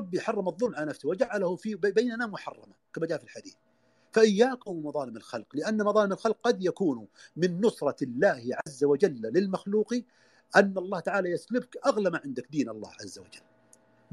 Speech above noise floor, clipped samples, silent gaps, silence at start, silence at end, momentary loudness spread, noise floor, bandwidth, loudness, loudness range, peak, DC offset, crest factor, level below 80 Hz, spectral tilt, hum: 34 dB; under 0.1%; none; 0 s; 0.75 s; 14 LU; -62 dBFS; 12 kHz; -28 LUFS; 4 LU; -6 dBFS; under 0.1%; 24 dB; -76 dBFS; -5.5 dB/octave; none